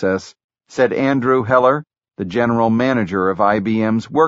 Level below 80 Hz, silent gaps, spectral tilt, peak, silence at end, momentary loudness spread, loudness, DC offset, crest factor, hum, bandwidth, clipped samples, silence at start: -54 dBFS; 0.44-0.49 s; -5.5 dB/octave; -2 dBFS; 0 s; 9 LU; -17 LUFS; under 0.1%; 16 dB; none; 8 kHz; under 0.1%; 0 s